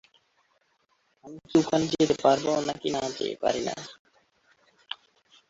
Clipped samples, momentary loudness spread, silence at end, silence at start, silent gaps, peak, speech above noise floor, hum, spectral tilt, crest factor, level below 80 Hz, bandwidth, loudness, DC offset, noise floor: under 0.1%; 17 LU; 0.55 s; 1.25 s; 3.99-4.05 s; -8 dBFS; 44 dB; none; -4.5 dB/octave; 22 dB; -64 dBFS; 8 kHz; -26 LUFS; under 0.1%; -70 dBFS